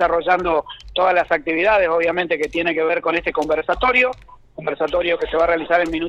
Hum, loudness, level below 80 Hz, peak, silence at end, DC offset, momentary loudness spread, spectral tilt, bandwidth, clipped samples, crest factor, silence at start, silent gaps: none; -18 LUFS; -42 dBFS; -2 dBFS; 0 s; under 0.1%; 6 LU; -5 dB/octave; 8.4 kHz; under 0.1%; 16 dB; 0 s; none